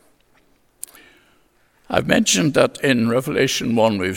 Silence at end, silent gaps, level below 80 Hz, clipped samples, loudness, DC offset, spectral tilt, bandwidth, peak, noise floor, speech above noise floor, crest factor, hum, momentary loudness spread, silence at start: 0 s; none; -54 dBFS; under 0.1%; -18 LUFS; under 0.1%; -4 dB/octave; 17.5 kHz; 0 dBFS; -58 dBFS; 41 dB; 20 dB; none; 21 LU; 1.9 s